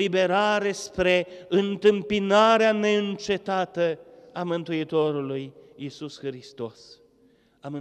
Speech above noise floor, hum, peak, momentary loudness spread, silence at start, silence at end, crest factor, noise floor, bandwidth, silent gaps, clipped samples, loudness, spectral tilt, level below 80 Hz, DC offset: 37 dB; none; -8 dBFS; 18 LU; 0 s; 0 s; 18 dB; -61 dBFS; 11 kHz; none; under 0.1%; -24 LUFS; -5 dB/octave; -58 dBFS; under 0.1%